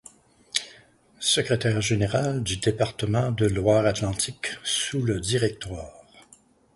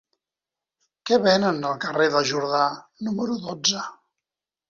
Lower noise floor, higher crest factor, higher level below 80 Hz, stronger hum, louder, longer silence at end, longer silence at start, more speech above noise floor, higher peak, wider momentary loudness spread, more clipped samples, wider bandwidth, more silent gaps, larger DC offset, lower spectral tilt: second, -57 dBFS vs -89 dBFS; about the same, 20 dB vs 18 dB; first, -48 dBFS vs -66 dBFS; neither; about the same, -25 LUFS vs -23 LUFS; second, 0.55 s vs 0.75 s; second, 0.55 s vs 1.05 s; second, 33 dB vs 66 dB; about the same, -6 dBFS vs -6 dBFS; second, 8 LU vs 11 LU; neither; first, 11.5 kHz vs 7.6 kHz; neither; neither; about the same, -4.5 dB/octave vs -3.5 dB/octave